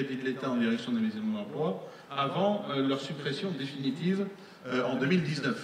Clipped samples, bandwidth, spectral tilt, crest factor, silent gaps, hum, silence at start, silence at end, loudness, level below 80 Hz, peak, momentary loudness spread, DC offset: under 0.1%; 11 kHz; -6.5 dB/octave; 16 dB; none; none; 0 s; 0 s; -31 LUFS; -76 dBFS; -14 dBFS; 6 LU; under 0.1%